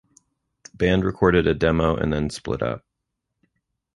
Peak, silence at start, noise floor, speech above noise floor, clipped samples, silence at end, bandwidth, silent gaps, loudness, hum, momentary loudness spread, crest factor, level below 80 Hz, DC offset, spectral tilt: -2 dBFS; 0.75 s; -80 dBFS; 59 dB; under 0.1%; 1.2 s; 11.5 kHz; none; -22 LUFS; none; 8 LU; 20 dB; -38 dBFS; under 0.1%; -6.5 dB/octave